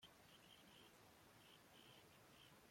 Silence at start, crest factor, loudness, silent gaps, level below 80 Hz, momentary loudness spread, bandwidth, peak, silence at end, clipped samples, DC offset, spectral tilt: 0 s; 14 dB; -67 LUFS; none; -88 dBFS; 2 LU; 16.5 kHz; -54 dBFS; 0 s; under 0.1%; under 0.1%; -3 dB/octave